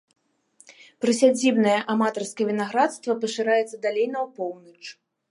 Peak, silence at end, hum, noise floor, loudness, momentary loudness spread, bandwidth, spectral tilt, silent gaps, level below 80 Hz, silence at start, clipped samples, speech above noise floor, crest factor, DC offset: -6 dBFS; 0.4 s; none; -59 dBFS; -23 LUFS; 14 LU; 11.5 kHz; -4 dB/octave; none; -78 dBFS; 1 s; under 0.1%; 36 dB; 20 dB; under 0.1%